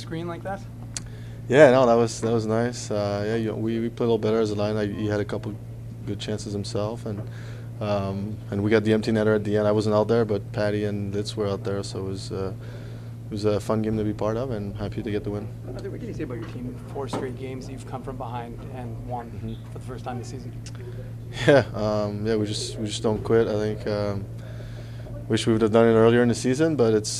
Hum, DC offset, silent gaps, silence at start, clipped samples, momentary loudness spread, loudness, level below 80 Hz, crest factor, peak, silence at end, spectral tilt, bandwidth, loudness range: none; under 0.1%; none; 0 s; under 0.1%; 17 LU; -25 LUFS; -46 dBFS; 22 dB; -2 dBFS; 0 s; -6 dB/octave; 13.5 kHz; 11 LU